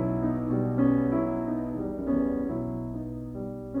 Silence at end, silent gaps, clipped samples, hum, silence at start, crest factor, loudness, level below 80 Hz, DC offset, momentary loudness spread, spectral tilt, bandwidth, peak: 0 s; none; under 0.1%; none; 0 s; 16 dB; -29 LUFS; -48 dBFS; under 0.1%; 12 LU; -11 dB/octave; 3.3 kHz; -12 dBFS